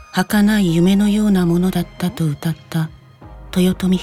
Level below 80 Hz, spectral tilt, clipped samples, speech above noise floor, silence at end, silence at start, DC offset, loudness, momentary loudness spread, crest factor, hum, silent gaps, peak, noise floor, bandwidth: -38 dBFS; -6.5 dB/octave; under 0.1%; 23 dB; 0 s; 0 s; under 0.1%; -17 LUFS; 9 LU; 14 dB; none; none; -4 dBFS; -39 dBFS; 16 kHz